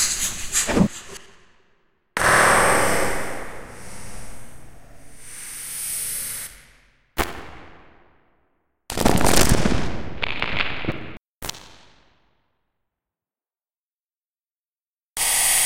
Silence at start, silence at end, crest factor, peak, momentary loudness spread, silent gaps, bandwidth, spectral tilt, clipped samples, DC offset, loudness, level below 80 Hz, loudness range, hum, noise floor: 0 s; 0 s; 24 dB; 0 dBFS; 23 LU; 13.93-13.97 s, 14.06-14.20 s, 14.93-14.97 s; 17 kHz; -2.5 dB/octave; under 0.1%; under 0.1%; -21 LUFS; -36 dBFS; 11 LU; none; under -90 dBFS